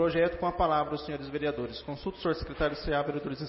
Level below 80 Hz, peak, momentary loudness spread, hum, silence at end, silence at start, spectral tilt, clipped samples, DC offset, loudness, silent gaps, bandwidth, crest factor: -46 dBFS; -14 dBFS; 9 LU; none; 0 s; 0 s; -10 dB/octave; under 0.1%; under 0.1%; -31 LUFS; none; 5.8 kHz; 16 dB